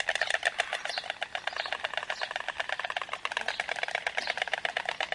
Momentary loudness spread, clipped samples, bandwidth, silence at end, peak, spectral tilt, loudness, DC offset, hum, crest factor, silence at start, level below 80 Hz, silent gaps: 6 LU; under 0.1%; 11.5 kHz; 0 s; -10 dBFS; 0.5 dB/octave; -32 LUFS; under 0.1%; none; 24 dB; 0 s; -70 dBFS; none